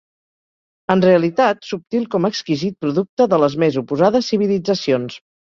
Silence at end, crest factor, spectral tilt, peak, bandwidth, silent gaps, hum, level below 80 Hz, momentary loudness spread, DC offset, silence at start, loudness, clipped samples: 0.3 s; 18 dB; -6.5 dB/octave; 0 dBFS; 7.4 kHz; 3.09-3.17 s; none; -58 dBFS; 8 LU; under 0.1%; 0.9 s; -17 LUFS; under 0.1%